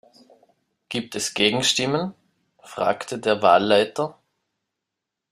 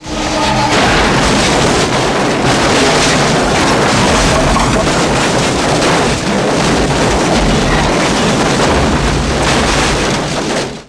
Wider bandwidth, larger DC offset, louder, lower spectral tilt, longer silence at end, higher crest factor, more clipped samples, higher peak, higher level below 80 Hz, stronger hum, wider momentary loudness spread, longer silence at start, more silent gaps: first, 15.5 kHz vs 11 kHz; second, under 0.1% vs 0.6%; second, -21 LUFS vs -11 LUFS; about the same, -3 dB/octave vs -4 dB/octave; first, 1.2 s vs 0.05 s; first, 22 dB vs 10 dB; neither; about the same, -2 dBFS vs -2 dBFS; second, -64 dBFS vs -24 dBFS; neither; first, 13 LU vs 3 LU; first, 0.9 s vs 0 s; neither